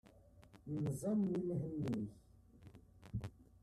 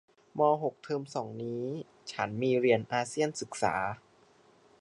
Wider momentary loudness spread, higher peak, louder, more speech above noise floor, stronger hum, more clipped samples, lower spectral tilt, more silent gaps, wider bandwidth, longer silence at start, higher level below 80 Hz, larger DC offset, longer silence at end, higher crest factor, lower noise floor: first, 24 LU vs 12 LU; second, -28 dBFS vs -12 dBFS; second, -42 LUFS vs -32 LUFS; second, 25 dB vs 32 dB; neither; neither; first, -8.5 dB/octave vs -5 dB/octave; neither; first, 13 kHz vs 11 kHz; second, 0.05 s vs 0.35 s; about the same, -64 dBFS vs -68 dBFS; neither; second, 0.05 s vs 0.85 s; about the same, 16 dB vs 20 dB; about the same, -64 dBFS vs -63 dBFS